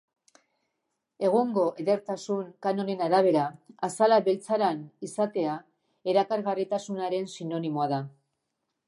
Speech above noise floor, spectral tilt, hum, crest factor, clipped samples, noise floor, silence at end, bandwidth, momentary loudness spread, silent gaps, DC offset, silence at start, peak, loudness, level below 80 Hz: 55 dB; -6 dB/octave; none; 18 dB; under 0.1%; -81 dBFS; 0.8 s; 11.5 kHz; 11 LU; none; under 0.1%; 1.2 s; -10 dBFS; -28 LUFS; -82 dBFS